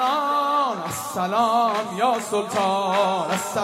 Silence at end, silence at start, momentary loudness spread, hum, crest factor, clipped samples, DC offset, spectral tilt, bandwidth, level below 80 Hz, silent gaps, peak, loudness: 0 s; 0 s; 5 LU; none; 14 dB; under 0.1%; under 0.1%; -3.5 dB/octave; 16 kHz; -68 dBFS; none; -8 dBFS; -22 LUFS